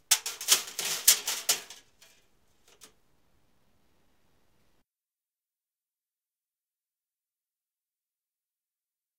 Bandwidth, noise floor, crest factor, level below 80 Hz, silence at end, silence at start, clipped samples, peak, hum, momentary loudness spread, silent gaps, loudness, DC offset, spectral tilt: 16 kHz; under -90 dBFS; 32 dB; -78 dBFS; 7.45 s; 0.1 s; under 0.1%; -4 dBFS; none; 8 LU; none; -25 LUFS; under 0.1%; 3 dB/octave